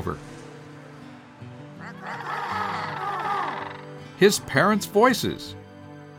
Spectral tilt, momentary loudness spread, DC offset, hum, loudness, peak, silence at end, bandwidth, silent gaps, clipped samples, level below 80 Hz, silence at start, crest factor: -4.5 dB/octave; 24 LU; under 0.1%; none; -24 LUFS; -4 dBFS; 0 s; 20 kHz; none; under 0.1%; -58 dBFS; 0 s; 22 dB